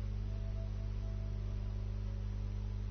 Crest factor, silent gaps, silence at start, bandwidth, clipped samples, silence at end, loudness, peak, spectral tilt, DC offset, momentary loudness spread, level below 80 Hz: 8 dB; none; 0 s; 6.4 kHz; under 0.1%; 0 s; -42 LUFS; -30 dBFS; -8.5 dB/octave; under 0.1%; 0 LU; -40 dBFS